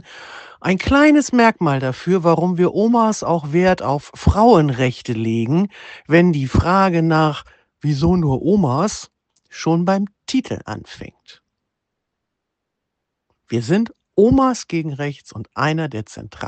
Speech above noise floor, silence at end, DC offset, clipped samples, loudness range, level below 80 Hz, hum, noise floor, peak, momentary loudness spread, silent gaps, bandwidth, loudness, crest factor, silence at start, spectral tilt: 62 dB; 0 s; under 0.1%; under 0.1%; 10 LU; -36 dBFS; none; -78 dBFS; 0 dBFS; 16 LU; none; 8.8 kHz; -17 LUFS; 18 dB; 0.1 s; -6.5 dB/octave